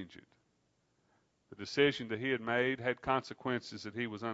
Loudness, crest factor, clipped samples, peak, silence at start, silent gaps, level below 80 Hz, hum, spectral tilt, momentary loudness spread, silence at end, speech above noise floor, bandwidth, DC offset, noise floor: -35 LUFS; 22 dB; under 0.1%; -14 dBFS; 0 s; none; -70 dBFS; none; -3 dB/octave; 10 LU; 0 s; 41 dB; 7.6 kHz; under 0.1%; -77 dBFS